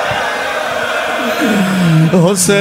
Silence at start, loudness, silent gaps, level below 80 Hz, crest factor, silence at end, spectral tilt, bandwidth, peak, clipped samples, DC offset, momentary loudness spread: 0 s; -13 LUFS; none; -48 dBFS; 12 dB; 0 s; -4.5 dB/octave; 16.5 kHz; 0 dBFS; under 0.1%; under 0.1%; 6 LU